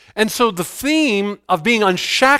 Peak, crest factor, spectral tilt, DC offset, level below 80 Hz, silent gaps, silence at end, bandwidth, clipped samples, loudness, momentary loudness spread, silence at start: 0 dBFS; 16 dB; -3.5 dB/octave; under 0.1%; -52 dBFS; none; 0 s; 16.5 kHz; under 0.1%; -17 LUFS; 6 LU; 0.15 s